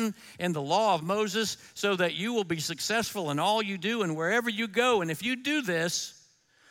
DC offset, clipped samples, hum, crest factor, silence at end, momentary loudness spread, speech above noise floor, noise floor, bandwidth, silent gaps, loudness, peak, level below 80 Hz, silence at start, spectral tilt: under 0.1%; under 0.1%; none; 18 dB; 0.6 s; 6 LU; 34 dB; -62 dBFS; 17 kHz; none; -28 LUFS; -12 dBFS; -72 dBFS; 0 s; -3.5 dB/octave